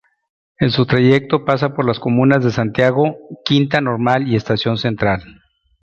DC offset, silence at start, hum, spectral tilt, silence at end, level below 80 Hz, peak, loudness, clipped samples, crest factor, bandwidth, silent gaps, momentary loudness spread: under 0.1%; 0.6 s; none; -7.5 dB/octave; 0.5 s; -46 dBFS; 0 dBFS; -16 LUFS; under 0.1%; 16 dB; 7.4 kHz; none; 6 LU